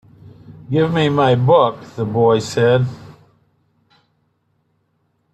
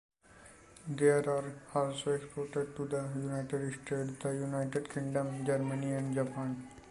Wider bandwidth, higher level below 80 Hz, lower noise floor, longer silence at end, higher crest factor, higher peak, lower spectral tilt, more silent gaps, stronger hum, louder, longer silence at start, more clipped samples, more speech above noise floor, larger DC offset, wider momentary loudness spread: about the same, 11.5 kHz vs 11.5 kHz; first, -56 dBFS vs -68 dBFS; first, -65 dBFS vs -58 dBFS; first, 2.25 s vs 0 s; about the same, 16 dB vs 20 dB; first, -2 dBFS vs -16 dBFS; about the same, -7 dB/octave vs -6.5 dB/octave; neither; neither; first, -16 LUFS vs -35 LUFS; first, 0.5 s vs 0.35 s; neither; first, 50 dB vs 24 dB; neither; first, 11 LU vs 8 LU